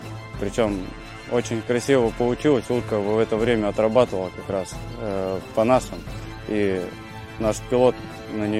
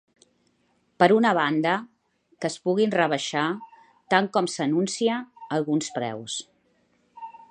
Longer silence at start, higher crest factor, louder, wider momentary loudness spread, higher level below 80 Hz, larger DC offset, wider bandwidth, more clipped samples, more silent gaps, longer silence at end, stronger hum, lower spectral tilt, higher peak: second, 0 s vs 1 s; about the same, 20 dB vs 24 dB; about the same, -23 LUFS vs -24 LUFS; about the same, 15 LU vs 13 LU; first, -42 dBFS vs -76 dBFS; first, 0.1% vs under 0.1%; first, 14.5 kHz vs 10 kHz; neither; neither; second, 0 s vs 0.2 s; neither; first, -6 dB/octave vs -4.5 dB/octave; about the same, -2 dBFS vs -2 dBFS